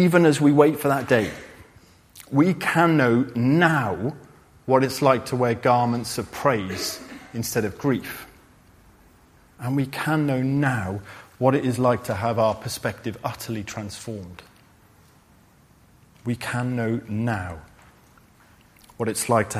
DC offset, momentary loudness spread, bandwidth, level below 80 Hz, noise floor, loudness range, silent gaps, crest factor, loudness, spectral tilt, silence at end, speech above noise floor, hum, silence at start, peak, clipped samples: under 0.1%; 17 LU; 15.5 kHz; -56 dBFS; -55 dBFS; 10 LU; none; 22 dB; -23 LUFS; -6 dB/octave; 0 s; 33 dB; none; 0 s; -2 dBFS; under 0.1%